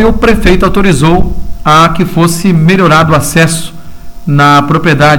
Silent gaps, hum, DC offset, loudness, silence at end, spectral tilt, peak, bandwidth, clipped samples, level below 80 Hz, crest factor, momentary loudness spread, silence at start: none; none; 6%; -7 LUFS; 0 s; -5.5 dB/octave; 0 dBFS; 18 kHz; 0.3%; -20 dBFS; 8 dB; 8 LU; 0 s